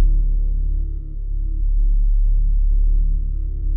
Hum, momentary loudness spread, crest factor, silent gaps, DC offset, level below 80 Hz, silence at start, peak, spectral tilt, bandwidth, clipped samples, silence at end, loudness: none; 7 LU; 10 dB; none; under 0.1%; -16 dBFS; 0 s; -8 dBFS; -14.5 dB/octave; 0.5 kHz; under 0.1%; 0 s; -23 LUFS